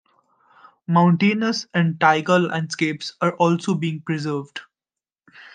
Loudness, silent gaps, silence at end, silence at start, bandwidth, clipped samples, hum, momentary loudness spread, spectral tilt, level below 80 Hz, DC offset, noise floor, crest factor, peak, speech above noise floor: -20 LUFS; none; 0.05 s; 0.9 s; 9.4 kHz; under 0.1%; none; 10 LU; -6 dB/octave; -70 dBFS; under 0.1%; under -90 dBFS; 20 dB; -2 dBFS; over 70 dB